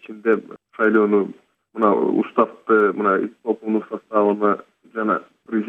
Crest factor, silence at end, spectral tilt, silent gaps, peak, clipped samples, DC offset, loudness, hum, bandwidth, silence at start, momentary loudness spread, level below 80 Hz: 18 dB; 0 s; -9 dB/octave; none; -2 dBFS; under 0.1%; under 0.1%; -20 LUFS; none; 3.9 kHz; 0.1 s; 9 LU; -72 dBFS